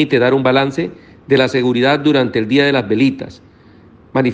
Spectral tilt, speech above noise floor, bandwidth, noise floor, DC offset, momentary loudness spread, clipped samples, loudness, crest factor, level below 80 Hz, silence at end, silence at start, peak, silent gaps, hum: -6.5 dB/octave; 30 dB; 8.2 kHz; -44 dBFS; under 0.1%; 10 LU; under 0.1%; -14 LUFS; 14 dB; -52 dBFS; 0 s; 0 s; 0 dBFS; none; none